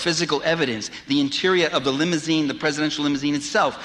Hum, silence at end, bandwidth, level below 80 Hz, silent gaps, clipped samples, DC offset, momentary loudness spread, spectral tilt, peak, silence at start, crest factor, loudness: none; 0 s; 11 kHz; -58 dBFS; none; under 0.1%; under 0.1%; 4 LU; -4 dB/octave; -8 dBFS; 0 s; 14 dB; -21 LUFS